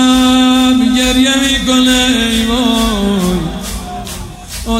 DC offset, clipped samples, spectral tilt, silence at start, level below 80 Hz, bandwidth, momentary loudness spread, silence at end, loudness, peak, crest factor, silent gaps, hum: under 0.1%; under 0.1%; -3.5 dB/octave; 0 s; -26 dBFS; 16 kHz; 15 LU; 0 s; -10 LUFS; 0 dBFS; 12 dB; none; none